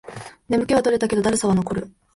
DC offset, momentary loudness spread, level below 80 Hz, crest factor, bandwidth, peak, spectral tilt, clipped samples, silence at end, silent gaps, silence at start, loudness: under 0.1%; 13 LU; -48 dBFS; 14 dB; 11.5 kHz; -6 dBFS; -5.5 dB/octave; under 0.1%; 0.25 s; none; 0.05 s; -21 LUFS